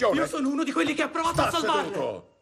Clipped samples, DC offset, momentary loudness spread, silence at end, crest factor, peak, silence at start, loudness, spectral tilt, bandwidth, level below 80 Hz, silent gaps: under 0.1%; under 0.1%; 6 LU; 0.2 s; 14 dB; -10 dBFS; 0 s; -26 LUFS; -4 dB/octave; 13.5 kHz; -52 dBFS; none